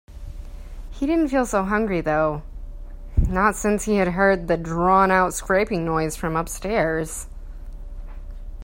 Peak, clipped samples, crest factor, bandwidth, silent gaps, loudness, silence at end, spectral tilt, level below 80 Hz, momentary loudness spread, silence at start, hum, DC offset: -4 dBFS; under 0.1%; 20 dB; 16 kHz; none; -21 LUFS; 0 s; -5.5 dB/octave; -32 dBFS; 22 LU; 0.1 s; none; under 0.1%